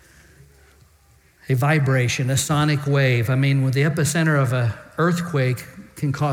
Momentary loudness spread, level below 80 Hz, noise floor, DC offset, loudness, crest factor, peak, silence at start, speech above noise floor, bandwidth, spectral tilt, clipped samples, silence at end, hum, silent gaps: 7 LU; -56 dBFS; -55 dBFS; under 0.1%; -20 LUFS; 14 dB; -8 dBFS; 1.5 s; 36 dB; 16.5 kHz; -5.5 dB/octave; under 0.1%; 0 s; none; none